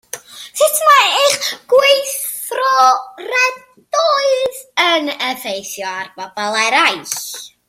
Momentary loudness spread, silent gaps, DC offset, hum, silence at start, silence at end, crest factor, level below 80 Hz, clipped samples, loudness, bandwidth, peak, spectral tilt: 13 LU; none; under 0.1%; none; 0.15 s; 0.2 s; 16 dB; -68 dBFS; under 0.1%; -14 LUFS; 16.5 kHz; 0 dBFS; 0 dB/octave